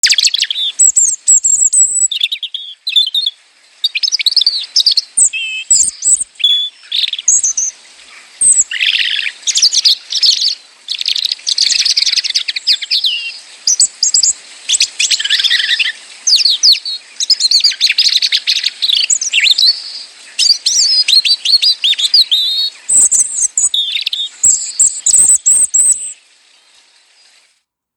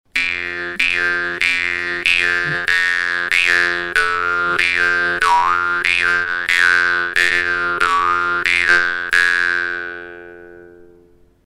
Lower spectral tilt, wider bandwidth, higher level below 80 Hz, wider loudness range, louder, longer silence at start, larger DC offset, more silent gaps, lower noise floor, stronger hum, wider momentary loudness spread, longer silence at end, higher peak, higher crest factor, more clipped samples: second, 5.5 dB/octave vs -1.5 dB/octave; first, over 20 kHz vs 16 kHz; second, -60 dBFS vs -50 dBFS; about the same, 3 LU vs 2 LU; first, -9 LUFS vs -15 LUFS; about the same, 0.05 s vs 0.15 s; neither; neither; first, -61 dBFS vs -50 dBFS; neither; first, 9 LU vs 6 LU; first, 1.85 s vs 0.6 s; about the same, 0 dBFS vs 0 dBFS; about the same, 14 dB vs 18 dB; neither